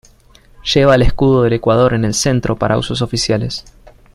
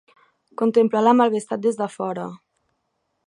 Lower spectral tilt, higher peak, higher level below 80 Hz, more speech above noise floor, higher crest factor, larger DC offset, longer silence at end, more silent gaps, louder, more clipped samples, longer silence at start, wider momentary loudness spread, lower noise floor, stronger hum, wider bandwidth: about the same, -5 dB/octave vs -6 dB/octave; first, 0 dBFS vs -4 dBFS; first, -28 dBFS vs -76 dBFS; second, 33 dB vs 54 dB; about the same, 14 dB vs 18 dB; neither; second, 0.55 s vs 0.9 s; neither; first, -14 LUFS vs -20 LUFS; neither; about the same, 0.65 s vs 0.6 s; second, 7 LU vs 15 LU; second, -46 dBFS vs -74 dBFS; neither; first, 14 kHz vs 11 kHz